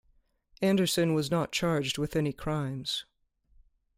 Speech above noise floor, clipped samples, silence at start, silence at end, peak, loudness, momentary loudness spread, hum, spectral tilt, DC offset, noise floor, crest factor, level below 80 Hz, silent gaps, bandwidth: 39 dB; under 0.1%; 0.6 s; 0.95 s; -14 dBFS; -29 LUFS; 7 LU; none; -5 dB/octave; under 0.1%; -68 dBFS; 16 dB; -56 dBFS; none; 16 kHz